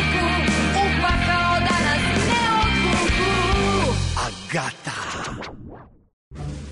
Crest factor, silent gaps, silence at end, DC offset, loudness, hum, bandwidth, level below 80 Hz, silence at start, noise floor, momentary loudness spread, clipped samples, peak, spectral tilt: 10 dB; 6.13-6.31 s; 0 s; under 0.1%; -20 LUFS; none; 11 kHz; -30 dBFS; 0 s; -42 dBFS; 13 LU; under 0.1%; -10 dBFS; -4.5 dB/octave